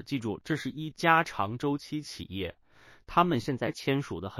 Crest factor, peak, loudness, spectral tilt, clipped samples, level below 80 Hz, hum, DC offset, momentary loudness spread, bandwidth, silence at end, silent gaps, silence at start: 22 dB; -8 dBFS; -30 LUFS; -5.5 dB/octave; under 0.1%; -58 dBFS; none; under 0.1%; 13 LU; 16 kHz; 0 s; none; 0 s